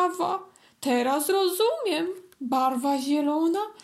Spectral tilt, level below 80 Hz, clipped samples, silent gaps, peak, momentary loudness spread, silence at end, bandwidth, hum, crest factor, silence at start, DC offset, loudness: -2.5 dB/octave; -80 dBFS; under 0.1%; none; -12 dBFS; 8 LU; 0.1 s; 16 kHz; none; 12 dB; 0 s; under 0.1%; -26 LUFS